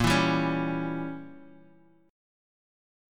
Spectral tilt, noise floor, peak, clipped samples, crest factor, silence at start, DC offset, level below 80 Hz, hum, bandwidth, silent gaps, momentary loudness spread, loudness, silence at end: -5.5 dB/octave; -59 dBFS; -10 dBFS; under 0.1%; 20 dB; 0 s; under 0.1%; -50 dBFS; none; 17.5 kHz; none; 18 LU; -28 LUFS; 0.95 s